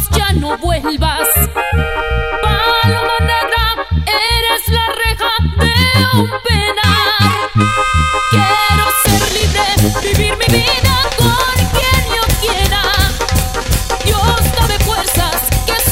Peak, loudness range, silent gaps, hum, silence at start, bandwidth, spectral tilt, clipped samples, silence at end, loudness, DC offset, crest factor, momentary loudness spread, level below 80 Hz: -2 dBFS; 2 LU; none; none; 0 s; 16.5 kHz; -3.5 dB/octave; under 0.1%; 0 s; -12 LUFS; 0.5%; 10 dB; 5 LU; -20 dBFS